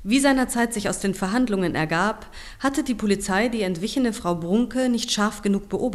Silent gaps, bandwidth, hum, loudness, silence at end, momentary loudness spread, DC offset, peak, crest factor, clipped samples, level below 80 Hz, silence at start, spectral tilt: none; 14 kHz; none; -23 LUFS; 0 s; 5 LU; under 0.1%; -6 dBFS; 16 dB; under 0.1%; -44 dBFS; 0 s; -4.5 dB/octave